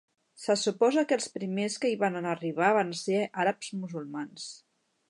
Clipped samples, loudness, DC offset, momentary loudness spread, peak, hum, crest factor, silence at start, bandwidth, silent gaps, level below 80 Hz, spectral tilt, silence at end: under 0.1%; -29 LUFS; under 0.1%; 13 LU; -10 dBFS; none; 20 dB; 0.4 s; 11.5 kHz; none; -82 dBFS; -4.5 dB/octave; 0.55 s